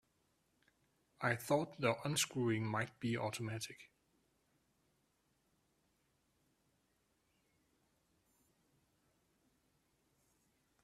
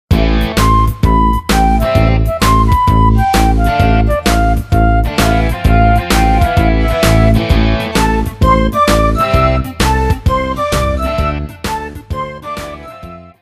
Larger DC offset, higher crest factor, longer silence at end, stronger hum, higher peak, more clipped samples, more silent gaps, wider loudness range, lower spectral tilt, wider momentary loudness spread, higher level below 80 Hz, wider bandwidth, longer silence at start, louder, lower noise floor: neither; first, 26 dB vs 12 dB; first, 7 s vs 0.15 s; neither; second, -20 dBFS vs 0 dBFS; neither; neither; first, 12 LU vs 4 LU; second, -4.5 dB/octave vs -6 dB/octave; about the same, 9 LU vs 11 LU; second, -78 dBFS vs -16 dBFS; about the same, 14.5 kHz vs 15.5 kHz; first, 1.2 s vs 0.1 s; second, -39 LUFS vs -12 LUFS; first, -80 dBFS vs -32 dBFS